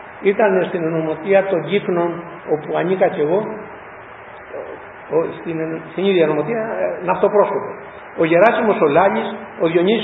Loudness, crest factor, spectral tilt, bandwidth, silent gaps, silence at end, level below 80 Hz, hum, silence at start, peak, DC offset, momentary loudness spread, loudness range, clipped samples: -18 LUFS; 18 dB; -9 dB/octave; 4 kHz; none; 0 s; -58 dBFS; none; 0 s; 0 dBFS; under 0.1%; 19 LU; 6 LU; under 0.1%